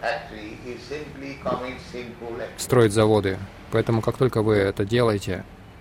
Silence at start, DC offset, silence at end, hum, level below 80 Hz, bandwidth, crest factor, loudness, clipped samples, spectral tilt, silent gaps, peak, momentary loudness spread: 0 s; under 0.1%; 0 s; none; -48 dBFS; 16.5 kHz; 18 dB; -23 LUFS; under 0.1%; -6 dB/octave; none; -6 dBFS; 17 LU